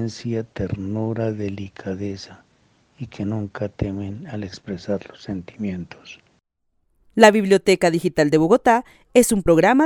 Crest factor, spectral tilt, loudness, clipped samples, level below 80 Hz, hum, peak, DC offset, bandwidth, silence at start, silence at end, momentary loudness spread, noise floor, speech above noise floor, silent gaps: 20 dB; -5.5 dB/octave; -20 LUFS; under 0.1%; -48 dBFS; none; 0 dBFS; under 0.1%; 17.5 kHz; 0 s; 0 s; 17 LU; -69 dBFS; 49 dB; none